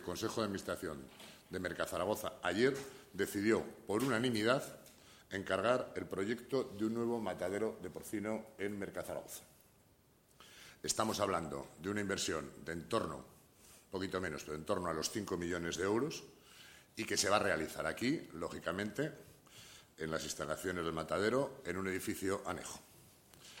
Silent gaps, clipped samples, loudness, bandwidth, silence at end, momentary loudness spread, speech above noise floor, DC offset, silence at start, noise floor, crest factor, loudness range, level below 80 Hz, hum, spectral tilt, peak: none; under 0.1%; -38 LUFS; 16.5 kHz; 0 s; 17 LU; 31 dB; under 0.1%; 0 s; -69 dBFS; 22 dB; 5 LU; -66 dBFS; none; -4 dB/octave; -16 dBFS